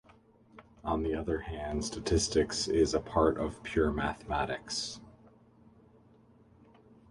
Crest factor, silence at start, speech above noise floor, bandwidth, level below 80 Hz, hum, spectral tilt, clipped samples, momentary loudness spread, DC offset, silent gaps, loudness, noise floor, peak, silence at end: 22 dB; 0.55 s; 30 dB; 11.5 kHz; -46 dBFS; none; -4.5 dB/octave; under 0.1%; 8 LU; under 0.1%; none; -32 LUFS; -61 dBFS; -12 dBFS; 2 s